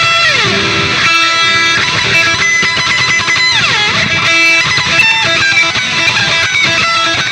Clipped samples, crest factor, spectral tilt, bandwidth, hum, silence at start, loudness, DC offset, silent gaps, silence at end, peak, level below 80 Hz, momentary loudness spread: under 0.1%; 10 dB; -1.5 dB/octave; 17 kHz; none; 0 s; -8 LUFS; under 0.1%; none; 0 s; 0 dBFS; -42 dBFS; 3 LU